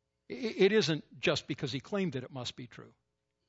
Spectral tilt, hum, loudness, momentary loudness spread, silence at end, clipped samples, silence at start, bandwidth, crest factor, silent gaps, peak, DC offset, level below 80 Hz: -5 dB/octave; none; -32 LUFS; 17 LU; 0.6 s; under 0.1%; 0.3 s; 8 kHz; 20 dB; none; -14 dBFS; under 0.1%; -70 dBFS